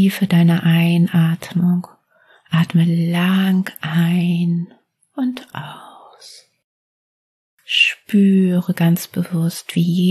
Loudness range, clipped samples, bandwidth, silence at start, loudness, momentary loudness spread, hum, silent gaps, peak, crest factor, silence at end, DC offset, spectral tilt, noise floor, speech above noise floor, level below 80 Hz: 7 LU; under 0.1%; 13.5 kHz; 0 s; -17 LUFS; 10 LU; none; 6.64-7.58 s; -2 dBFS; 16 dB; 0 s; under 0.1%; -6.5 dB/octave; -54 dBFS; 38 dB; -66 dBFS